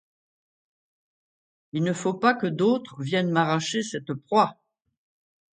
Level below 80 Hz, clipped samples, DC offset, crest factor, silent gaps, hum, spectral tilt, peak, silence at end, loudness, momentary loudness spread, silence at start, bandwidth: -72 dBFS; under 0.1%; under 0.1%; 22 dB; none; none; -5.5 dB/octave; -4 dBFS; 1 s; -25 LUFS; 6 LU; 1.75 s; 9.4 kHz